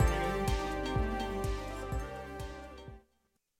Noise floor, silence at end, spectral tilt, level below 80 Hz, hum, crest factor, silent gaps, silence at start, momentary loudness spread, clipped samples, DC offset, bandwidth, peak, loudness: -77 dBFS; 0.6 s; -5.5 dB/octave; -38 dBFS; none; 18 dB; none; 0 s; 15 LU; under 0.1%; under 0.1%; 16 kHz; -16 dBFS; -36 LUFS